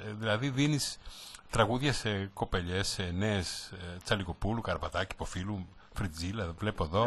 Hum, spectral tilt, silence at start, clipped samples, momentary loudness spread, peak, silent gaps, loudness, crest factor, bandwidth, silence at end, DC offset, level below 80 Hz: none; -5 dB/octave; 0 s; under 0.1%; 11 LU; -12 dBFS; none; -33 LUFS; 22 dB; 12 kHz; 0 s; under 0.1%; -48 dBFS